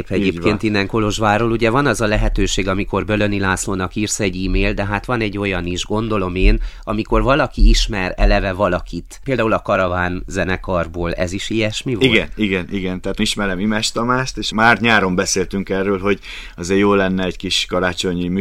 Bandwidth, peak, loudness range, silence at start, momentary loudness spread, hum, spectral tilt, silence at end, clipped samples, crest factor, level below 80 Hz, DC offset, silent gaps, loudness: 14 kHz; 0 dBFS; 3 LU; 0 s; 7 LU; none; -4.5 dB/octave; 0 s; under 0.1%; 18 dB; -24 dBFS; under 0.1%; none; -18 LUFS